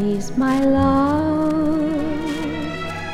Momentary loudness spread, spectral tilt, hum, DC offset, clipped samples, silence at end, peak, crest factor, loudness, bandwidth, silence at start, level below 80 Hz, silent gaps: 9 LU; -6.5 dB/octave; none; under 0.1%; under 0.1%; 0 s; -6 dBFS; 12 dB; -20 LUFS; 13 kHz; 0 s; -38 dBFS; none